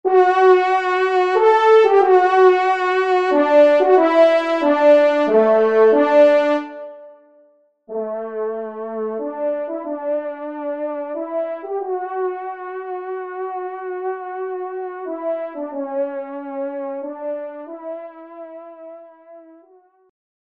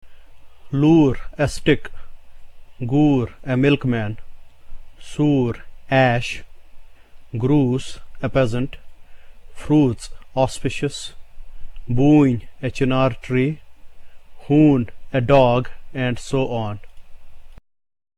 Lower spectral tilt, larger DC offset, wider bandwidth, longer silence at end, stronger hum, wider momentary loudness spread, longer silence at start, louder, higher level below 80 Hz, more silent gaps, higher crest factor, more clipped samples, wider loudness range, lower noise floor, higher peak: second, -5 dB/octave vs -7 dB/octave; neither; second, 8 kHz vs 11.5 kHz; first, 1.05 s vs 0.6 s; neither; about the same, 17 LU vs 18 LU; about the same, 0.05 s vs 0.05 s; about the same, -17 LUFS vs -19 LUFS; second, -74 dBFS vs -38 dBFS; neither; about the same, 16 dB vs 18 dB; neither; first, 14 LU vs 4 LU; first, -55 dBFS vs -39 dBFS; about the same, -2 dBFS vs -2 dBFS